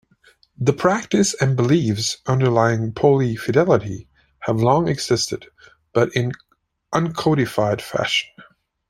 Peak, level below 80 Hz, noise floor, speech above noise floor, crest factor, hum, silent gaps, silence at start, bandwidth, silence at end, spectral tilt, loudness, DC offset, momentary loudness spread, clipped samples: -2 dBFS; -52 dBFS; -56 dBFS; 37 dB; 18 dB; none; none; 0.6 s; 14 kHz; 0.5 s; -5.5 dB/octave; -19 LUFS; under 0.1%; 8 LU; under 0.1%